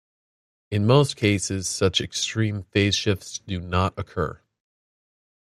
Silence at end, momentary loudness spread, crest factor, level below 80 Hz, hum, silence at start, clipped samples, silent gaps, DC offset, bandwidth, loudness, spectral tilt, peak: 1.1 s; 10 LU; 22 dB; -52 dBFS; none; 0.7 s; under 0.1%; none; under 0.1%; 13.5 kHz; -23 LUFS; -4.5 dB/octave; -4 dBFS